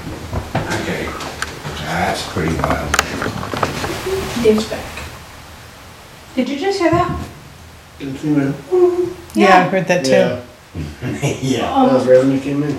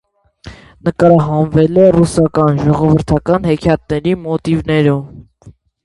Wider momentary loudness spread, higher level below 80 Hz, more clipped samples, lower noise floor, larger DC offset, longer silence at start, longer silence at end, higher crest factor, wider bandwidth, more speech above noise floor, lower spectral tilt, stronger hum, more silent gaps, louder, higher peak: first, 20 LU vs 8 LU; about the same, -38 dBFS vs -36 dBFS; neither; about the same, -39 dBFS vs -42 dBFS; neither; second, 0 s vs 0.45 s; second, 0 s vs 0.35 s; first, 18 dB vs 12 dB; first, over 20 kHz vs 11.5 kHz; second, 23 dB vs 31 dB; second, -5 dB/octave vs -8 dB/octave; neither; neither; second, -17 LUFS vs -13 LUFS; about the same, 0 dBFS vs 0 dBFS